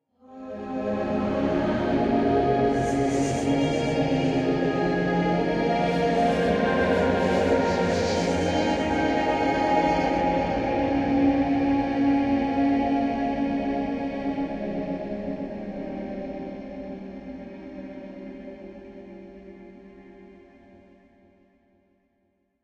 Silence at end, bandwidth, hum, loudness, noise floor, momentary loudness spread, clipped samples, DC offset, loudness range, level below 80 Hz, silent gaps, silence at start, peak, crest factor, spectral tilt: 2.3 s; 10 kHz; none; -24 LUFS; -71 dBFS; 17 LU; under 0.1%; under 0.1%; 16 LU; -46 dBFS; none; 0.3 s; -10 dBFS; 16 dB; -6.5 dB/octave